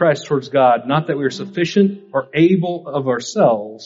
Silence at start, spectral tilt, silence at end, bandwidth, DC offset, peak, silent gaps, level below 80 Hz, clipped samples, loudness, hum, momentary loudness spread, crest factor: 0 s; -5.5 dB/octave; 0 s; 7.8 kHz; under 0.1%; -2 dBFS; none; -60 dBFS; under 0.1%; -17 LUFS; none; 7 LU; 14 dB